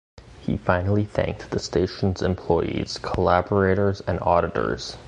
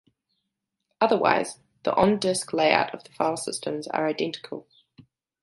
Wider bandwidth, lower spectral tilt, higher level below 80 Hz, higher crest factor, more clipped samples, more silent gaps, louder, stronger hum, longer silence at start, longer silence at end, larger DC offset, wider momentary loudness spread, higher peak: second, 9.8 kHz vs 11.5 kHz; first, -6.5 dB/octave vs -4 dB/octave; first, -38 dBFS vs -62 dBFS; about the same, 22 dB vs 24 dB; neither; neither; about the same, -23 LUFS vs -25 LUFS; neither; second, 0.2 s vs 1 s; second, 0 s vs 0.8 s; neither; second, 7 LU vs 11 LU; about the same, -2 dBFS vs -2 dBFS